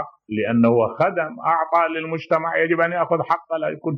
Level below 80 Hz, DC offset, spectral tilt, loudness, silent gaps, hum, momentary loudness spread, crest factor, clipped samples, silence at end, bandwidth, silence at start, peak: -68 dBFS; under 0.1%; -8.5 dB/octave; -20 LUFS; none; none; 7 LU; 16 dB; under 0.1%; 0 s; 6.2 kHz; 0 s; -6 dBFS